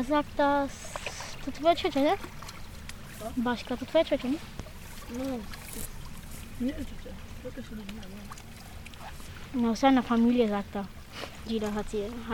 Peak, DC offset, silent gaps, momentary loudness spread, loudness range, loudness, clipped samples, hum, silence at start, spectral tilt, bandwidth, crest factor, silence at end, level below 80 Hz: -12 dBFS; 0.2%; none; 19 LU; 11 LU; -30 LUFS; under 0.1%; none; 0 s; -5 dB/octave; 18 kHz; 18 dB; 0 s; -46 dBFS